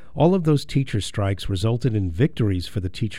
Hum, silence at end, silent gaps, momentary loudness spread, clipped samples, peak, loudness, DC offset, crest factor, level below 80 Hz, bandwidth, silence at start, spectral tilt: none; 0 s; none; 7 LU; under 0.1%; -6 dBFS; -22 LUFS; 2%; 16 dB; -40 dBFS; 14.5 kHz; 0.15 s; -7 dB/octave